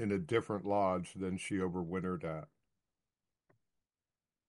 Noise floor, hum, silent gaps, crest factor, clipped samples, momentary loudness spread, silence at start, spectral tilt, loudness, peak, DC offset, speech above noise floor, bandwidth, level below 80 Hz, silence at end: under -90 dBFS; none; none; 20 dB; under 0.1%; 8 LU; 0 s; -6.5 dB/octave; -37 LUFS; -18 dBFS; under 0.1%; over 54 dB; 11.5 kHz; -70 dBFS; 2 s